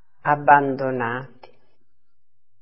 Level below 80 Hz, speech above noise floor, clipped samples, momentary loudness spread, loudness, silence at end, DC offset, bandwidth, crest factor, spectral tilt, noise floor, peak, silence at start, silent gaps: -68 dBFS; 57 dB; under 0.1%; 12 LU; -19 LUFS; 1.35 s; 0.6%; 5.8 kHz; 22 dB; -9.5 dB/octave; -76 dBFS; 0 dBFS; 0.25 s; none